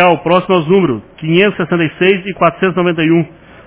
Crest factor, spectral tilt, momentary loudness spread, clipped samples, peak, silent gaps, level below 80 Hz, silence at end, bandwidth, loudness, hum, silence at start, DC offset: 12 dB; -10.5 dB/octave; 4 LU; 0.1%; 0 dBFS; none; -48 dBFS; 0.4 s; 4 kHz; -12 LUFS; none; 0 s; under 0.1%